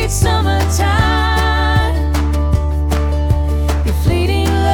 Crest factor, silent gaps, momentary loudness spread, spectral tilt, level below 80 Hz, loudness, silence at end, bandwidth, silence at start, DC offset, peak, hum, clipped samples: 12 dB; none; 3 LU; -5.5 dB/octave; -18 dBFS; -15 LUFS; 0 s; 17.5 kHz; 0 s; under 0.1%; -2 dBFS; none; under 0.1%